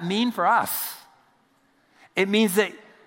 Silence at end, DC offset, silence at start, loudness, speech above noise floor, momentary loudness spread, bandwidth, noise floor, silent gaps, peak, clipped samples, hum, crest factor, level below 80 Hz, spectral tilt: 0.25 s; under 0.1%; 0 s; -23 LUFS; 41 dB; 11 LU; 16.5 kHz; -63 dBFS; none; -6 dBFS; under 0.1%; none; 20 dB; -78 dBFS; -4 dB/octave